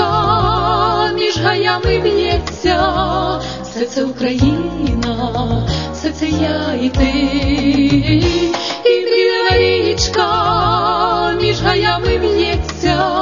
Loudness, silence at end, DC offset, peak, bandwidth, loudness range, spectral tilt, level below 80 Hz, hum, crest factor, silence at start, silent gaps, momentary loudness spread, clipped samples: -15 LUFS; 0 s; 0.4%; 0 dBFS; 7.4 kHz; 4 LU; -5.5 dB/octave; -28 dBFS; none; 14 dB; 0 s; none; 6 LU; under 0.1%